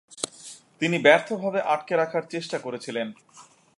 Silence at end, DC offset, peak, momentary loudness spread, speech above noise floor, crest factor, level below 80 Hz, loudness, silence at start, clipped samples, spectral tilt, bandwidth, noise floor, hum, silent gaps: 0.35 s; under 0.1%; -4 dBFS; 15 LU; 22 dB; 22 dB; -80 dBFS; -25 LUFS; 0.15 s; under 0.1%; -4 dB/octave; 11.5 kHz; -47 dBFS; none; none